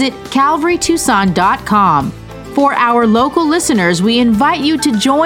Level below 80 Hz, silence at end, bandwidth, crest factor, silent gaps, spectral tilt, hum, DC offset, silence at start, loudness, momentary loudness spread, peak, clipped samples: -40 dBFS; 0 s; 17.5 kHz; 12 dB; none; -4.5 dB/octave; none; under 0.1%; 0 s; -12 LUFS; 4 LU; 0 dBFS; under 0.1%